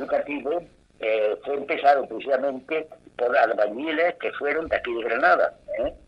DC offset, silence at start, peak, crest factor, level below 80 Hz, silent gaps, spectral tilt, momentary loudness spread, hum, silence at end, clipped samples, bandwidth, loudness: under 0.1%; 0 s; -6 dBFS; 18 dB; -56 dBFS; none; -5.5 dB/octave; 9 LU; none; 0.1 s; under 0.1%; 7.6 kHz; -24 LUFS